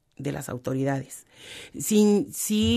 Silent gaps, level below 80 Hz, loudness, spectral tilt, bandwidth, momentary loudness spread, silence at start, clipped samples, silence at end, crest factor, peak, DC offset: none; -52 dBFS; -25 LUFS; -5 dB/octave; 14 kHz; 21 LU; 0.2 s; under 0.1%; 0 s; 16 dB; -10 dBFS; under 0.1%